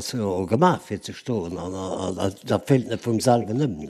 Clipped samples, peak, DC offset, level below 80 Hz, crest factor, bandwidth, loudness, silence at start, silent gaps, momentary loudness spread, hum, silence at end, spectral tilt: under 0.1%; -4 dBFS; under 0.1%; -56 dBFS; 20 dB; 13.5 kHz; -24 LUFS; 0 s; none; 10 LU; none; 0 s; -6 dB/octave